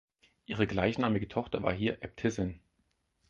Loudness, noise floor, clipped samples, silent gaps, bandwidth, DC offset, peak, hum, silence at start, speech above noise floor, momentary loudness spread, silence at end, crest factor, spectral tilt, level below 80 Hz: -33 LUFS; -76 dBFS; under 0.1%; none; 7.6 kHz; under 0.1%; -12 dBFS; none; 0.5 s; 45 dB; 7 LU; 0.7 s; 22 dB; -6.5 dB/octave; -54 dBFS